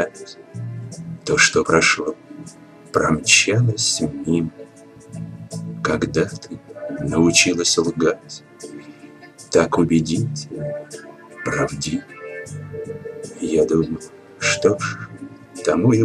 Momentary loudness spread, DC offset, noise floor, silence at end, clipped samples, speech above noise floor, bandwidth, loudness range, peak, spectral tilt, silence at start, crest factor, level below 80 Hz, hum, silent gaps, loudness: 22 LU; under 0.1%; -43 dBFS; 0 s; under 0.1%; 24 dB; 13.5 kHz; 7 LU; 0 dBFS; -4 dB/octave; 0 s; 20 dB; -48 dBFS; none; none; -19 LUFS